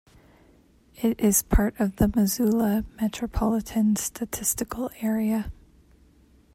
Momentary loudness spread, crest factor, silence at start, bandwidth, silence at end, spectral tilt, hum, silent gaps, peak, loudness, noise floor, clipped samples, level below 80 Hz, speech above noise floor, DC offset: 8 LU; 18 dB; 1 s; 16.5 kHz; 1 s; -5 dB/octave; none; none; -8 dBFS; -25 LUFS; -58 dBFS; under 0.1%; -36 dBFS; 33 dB; under 0.1%